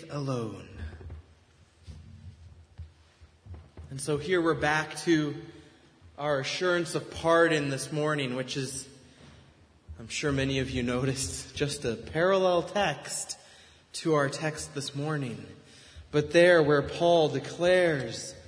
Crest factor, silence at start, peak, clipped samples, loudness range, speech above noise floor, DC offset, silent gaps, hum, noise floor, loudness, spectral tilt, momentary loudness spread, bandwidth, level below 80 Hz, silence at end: 22 dB; 0 s; -8 dBFS; under 0.1%; 8 LU; 32 dB; under 0.1%; none; none; -60 dBFS; -28 LUFS; -4.5 dB/octave; 20 LU; 11 kHz; -54 dBFS; 0.05 s